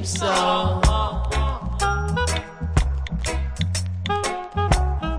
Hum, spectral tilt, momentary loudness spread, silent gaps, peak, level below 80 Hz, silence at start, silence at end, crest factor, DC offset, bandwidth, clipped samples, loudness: none; -4.5 dB/octave; 6 LU; none; -4 dBFS; -26 dBFS; 0 s; 0 s; 18 dB; under 0.1%; 10.5 kHz; under 0.1%; -23 LUFS